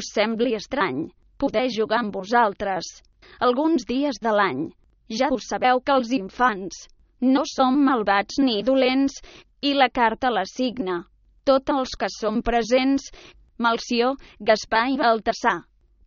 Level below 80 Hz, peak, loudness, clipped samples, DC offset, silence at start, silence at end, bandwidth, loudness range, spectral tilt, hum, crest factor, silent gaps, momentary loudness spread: -50 dBFS; -4 dBFS; -22 LUFS; under 0.1%; under 0.1%; 0 s; 0.45 s; 7.2 kHz; 3 LU; -2 dB/octave; none; 18 dB; none; 9 LU